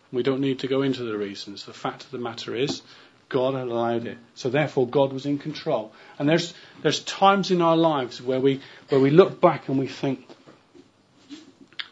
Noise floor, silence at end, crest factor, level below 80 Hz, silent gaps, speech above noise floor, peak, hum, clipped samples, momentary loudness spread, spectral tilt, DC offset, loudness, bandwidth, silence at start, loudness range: -56 dBFS; 0.05 s; 22 dB; -72 dBFS; none; 33 dB; -2 dBFS; none; under 0.1%; 14 LU; -6 dB/octave; under 0.1%; -24 LUFS; 8 kHz; 0.1 s; 8 LU